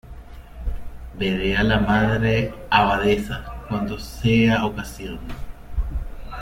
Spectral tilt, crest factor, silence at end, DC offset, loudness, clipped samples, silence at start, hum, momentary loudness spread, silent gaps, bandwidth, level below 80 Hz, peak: -6.5 dB/octave; 20 dB; 0 s; under 0.1%; -21 LUFS; under 0.1%; 0.05 s; none; 18 LU; none; 16.5 kHz; -32 dBFS; -2 dBFS